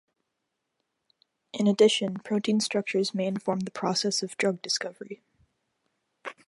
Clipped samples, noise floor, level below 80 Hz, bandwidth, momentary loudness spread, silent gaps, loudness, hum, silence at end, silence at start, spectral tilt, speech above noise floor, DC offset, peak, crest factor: under 0.1%; -82 dBFS; -78 dBFS; 11.5 kHz; 21 LU; none; -27 LUFS; none; 0.15 s; 1.55 s; -4 dB/octave; 55 dB; under 0.1%; -8 dBFS; 20 dB